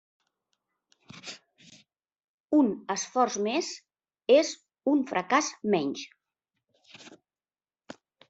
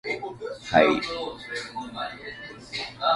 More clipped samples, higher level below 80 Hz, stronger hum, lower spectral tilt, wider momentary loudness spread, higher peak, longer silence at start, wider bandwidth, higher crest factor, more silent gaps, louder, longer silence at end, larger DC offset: neither; second, -78 dBFS vs -56 dBFS; neither; about the same, -3.5 dB/octave vs -4.5 dB/octave; first, 21 LU vs 17 LU; second, -8 dBFS vs -4 dBFS; first, 1.15 s vs 0.05 s; second, 8 kHz vs 11.5 kHz; about the same, 22 dB vs 22 dB; first, 2.24-2.48 s vs none; about the same, -27 LUFS vs -27 LUFS; first, 1.15 s vs 0 s; neither